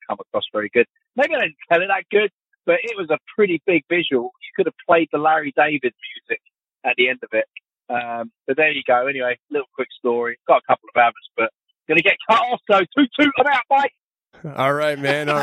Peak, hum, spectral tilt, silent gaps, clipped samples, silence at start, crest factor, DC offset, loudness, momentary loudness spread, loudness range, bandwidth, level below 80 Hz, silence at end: -2 dBFS; none; -5.5 dB/octave; 2.33-2.40 s, 9.42-9.47 s, 13.98-14.11 s; under 0.1%; 0.1 s; 18 dB; under 0.1%; -19 LUFS; 10 LU; 4 LU; 13 kHz; -68 dBFS; 0 s